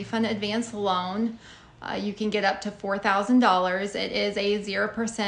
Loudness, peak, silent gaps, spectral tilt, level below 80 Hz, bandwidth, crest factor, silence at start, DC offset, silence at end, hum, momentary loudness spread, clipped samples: -26 LUFS; -6 dBFS; none; -4.5 dB/octave; -60 dBFS; 10 kHz; 20 dB; 0 s; under 0.1%; 0 s; none; 11 LU; under 0.1%